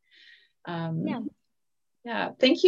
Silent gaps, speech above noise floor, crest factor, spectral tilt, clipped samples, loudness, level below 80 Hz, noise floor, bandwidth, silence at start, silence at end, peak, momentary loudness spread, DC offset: none; 62 dB; 20 dB; -6 dB/octave; under 0.1%; -30 LUFS; -78 dBFS; -87 dBFS; 7.6 kHz; 0.65 s; 0 s; -8 dBFS; 19 LU; under 0.1%